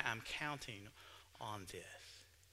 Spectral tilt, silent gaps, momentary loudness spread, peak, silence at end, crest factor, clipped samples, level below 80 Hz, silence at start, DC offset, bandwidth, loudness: -3 dB/octave; none; 16 LU; -20 dBFS; 0 s; 28 dB; under 0.1%; -70 dBFS; 0 s; under 0.1%; 16 kHz; -47 LUFS